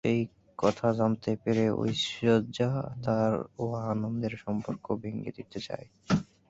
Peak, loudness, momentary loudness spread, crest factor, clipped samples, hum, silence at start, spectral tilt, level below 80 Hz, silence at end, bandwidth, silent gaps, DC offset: -10 dBFS; -30 LUFS; 11 LU; 20 dB; under 0.1%; none; 0.05 s; -6.5 dB/octave; -58 dBFS; 0.25 s; 8 kHz; none; under 0.1%